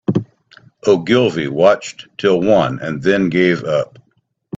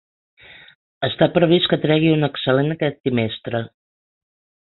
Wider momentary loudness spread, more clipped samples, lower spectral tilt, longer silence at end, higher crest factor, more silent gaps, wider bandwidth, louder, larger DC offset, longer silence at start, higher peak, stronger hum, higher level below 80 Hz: second, 8 LU vs 11 LU; neither; second, -6 dB/octave vs -11.5 dB/octave; second, 0.7 s vs 1 s; about the same, 16 dB vs 18 dB; second, none vs 3.00-3.04 s; first, 8 kHz vs 4.3 kHz; first, -16 LUFS vs -19 LUFS; neither; second, 0.1 s vs 1 s; about the same, 0 dBFS vs -2 dBFS; neither; about the same, -54 dBFS vs -54 dBFS